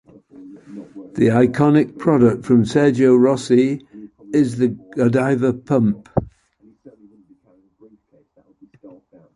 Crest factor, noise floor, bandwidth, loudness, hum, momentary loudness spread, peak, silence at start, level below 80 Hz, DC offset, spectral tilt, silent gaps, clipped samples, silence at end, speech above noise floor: 16 dB; -57 dBFS; 11 kHz; -17 LUFS; none; 13 LU; -2 dBFS; 0.4 s; -50 dBFS; under 0.1%; -8 dB/octave; none; under 0.1%; 0.5 s; 41 dB